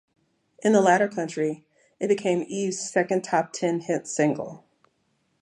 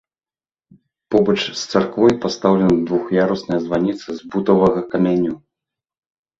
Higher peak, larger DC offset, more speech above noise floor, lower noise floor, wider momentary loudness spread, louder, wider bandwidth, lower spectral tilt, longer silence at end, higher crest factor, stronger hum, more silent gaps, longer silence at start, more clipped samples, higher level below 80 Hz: second, -6 dBFS vs -2 dBFS; neither; second, 47 dB vs over 73 dB; second, -71 dBFS vs under -90 dBFS; about the same, 9 LU vs 7 LU; second, -25 LUFS vs -18 LUFS; first, 11.5 kHz vs 7.6 kHz; second, -5 dB/octave vs -6.5 dB/octave; second, 0.85 s vs 1 s; about the same, 20 dB vs 18 dB; neither; neither; second, 0.65 s vs 1.1 s; neither; second, -76 dBFS vs -50 dBFS